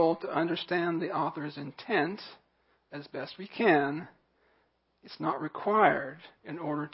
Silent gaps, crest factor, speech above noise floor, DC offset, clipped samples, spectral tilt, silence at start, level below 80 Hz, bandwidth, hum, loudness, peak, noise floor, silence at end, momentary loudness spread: none; 22 dB; 41 dB; under 0.1%; under 0.1%; -4 dB/octave; 0 s; -80 dBFS; 5.6 kHz; none; -30 LUFS; -10 dBFS; -72 dBFS; 0.05 s; 19 LU